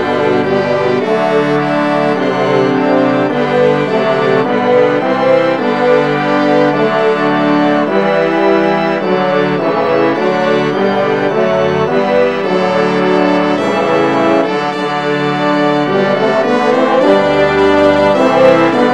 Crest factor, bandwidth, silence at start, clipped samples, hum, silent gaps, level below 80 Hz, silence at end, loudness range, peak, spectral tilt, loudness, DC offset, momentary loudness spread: 12 dB; 10 kHz; 0 s; under 0.1%; none; none; -46 dBFS; 0 s; 2 LU; 0 dBFS; -6.5 dB/octave; -12 LUFS; 0.6%; 3 LU